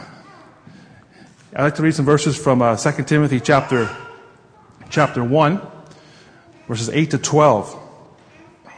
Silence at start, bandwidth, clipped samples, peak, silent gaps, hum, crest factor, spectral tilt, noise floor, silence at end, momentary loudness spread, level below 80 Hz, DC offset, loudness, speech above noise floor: 0 s; 10 kHz; under 0.1%; 0 dBFS; none; none; 20 dB; -5.5 dB/octave; -48 dBFS; 0.05 s; 16 LU; -54 dBFS; under 0.1%; -17 LUFS; 32 dB